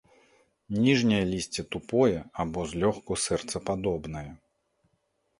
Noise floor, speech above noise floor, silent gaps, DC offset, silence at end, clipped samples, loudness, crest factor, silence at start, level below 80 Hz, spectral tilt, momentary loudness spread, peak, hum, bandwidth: -74 dBFS; 47 dB; none; under 0.1%; 1.05 s; under 0.1%; -28 LUFS; 20 dB; 0.7 s; -52 dBFS; -5 dB/octave; 11 LU; -10 dBFS; none; 11.5 kHz